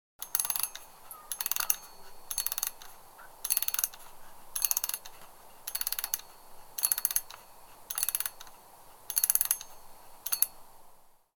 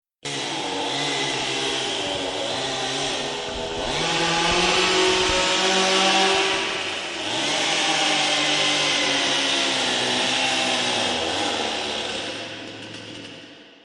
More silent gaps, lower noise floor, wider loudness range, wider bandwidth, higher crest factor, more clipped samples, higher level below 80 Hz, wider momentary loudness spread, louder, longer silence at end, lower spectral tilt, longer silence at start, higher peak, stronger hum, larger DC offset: neither; first, -56 dBFS vs -44 dBFS; second, 2 LU vs 5 LU; first, 19 kHz vs 11.5 kHz; first, 32 dB vs 16 dB; neither; second, -60 dBFS vs -50 dBFS; first, 23 LU vs 10 LU; second, -30 LUFS vs -21 LUFS; about the same, 0.25 s vs 0.15 s; second, 2.5 dB/octave vs -1.5 dB/octave; about the same, 0.2 s vs 0.25 s; first, -2 dBFS vs -6 dBFS; neither; neither